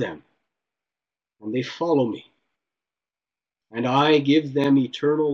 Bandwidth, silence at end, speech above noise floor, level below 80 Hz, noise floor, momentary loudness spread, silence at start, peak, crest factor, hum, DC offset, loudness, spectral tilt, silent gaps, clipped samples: 7.2 kHz; 0 s; over 69 dB; -70 dBFS; under -90 dBFS; 14 LU; 0 s; -6 dBFS; 18 dB; none; under 0.1%; -22 LUFS; -7 dB/octave; none; under 0.1%